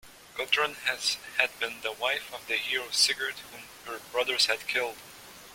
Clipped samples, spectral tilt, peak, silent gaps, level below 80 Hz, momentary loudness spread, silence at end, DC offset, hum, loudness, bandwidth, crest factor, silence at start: under 0.1%; 0.5 dB/octave; -6 dBFS; none; -68 dBFS; 17 LU; 0 s; under 0.1%; none; -28 LUFS; 16.5 kHz; 26 dB; 0.05 s